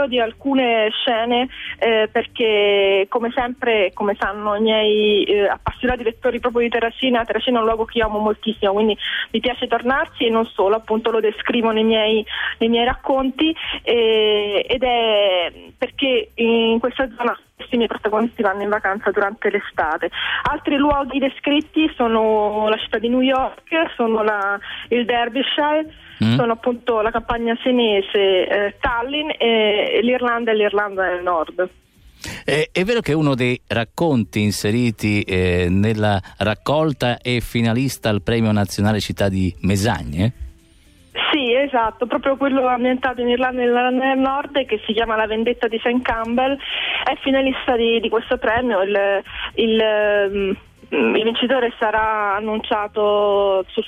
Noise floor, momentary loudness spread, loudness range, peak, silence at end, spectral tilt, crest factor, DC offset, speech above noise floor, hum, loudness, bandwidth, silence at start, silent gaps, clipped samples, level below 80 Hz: -50 dBFS; 5 LU; 2 LU; -6 dBFS; 0 s; -5.5 dB/octave; 12 dB; under 0.1%; 32 dB; none; -19 LUFS; 15 kHz; 0 s; none; under 0.1%; -44 dBFS